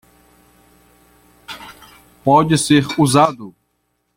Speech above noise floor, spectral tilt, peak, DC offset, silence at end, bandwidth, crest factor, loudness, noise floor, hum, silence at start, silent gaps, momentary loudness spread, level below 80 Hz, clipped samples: 54 dB; -5 dB/octave; -2 dBFS; under 0.1%; 0.65 s; 16.5 kHz; 18 dB; -14 LUFS; -68 dBFS; 60 Hz at -50 dBFS; 1.5 s; none; 22 LU; -52 dBFS; under 0.1%